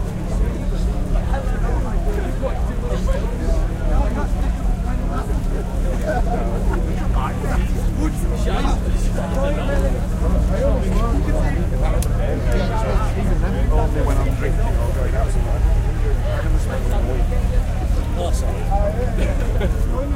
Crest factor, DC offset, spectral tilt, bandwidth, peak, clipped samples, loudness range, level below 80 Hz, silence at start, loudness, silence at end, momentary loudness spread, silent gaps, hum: 12 dB; under 0.1%; -7 dB/octave; 14 kHz; -6 dBFS; under 0.1%; 2 LU; -20 dBFS; 0 s; -22 LUFS; 0 s; 3 LU; none; none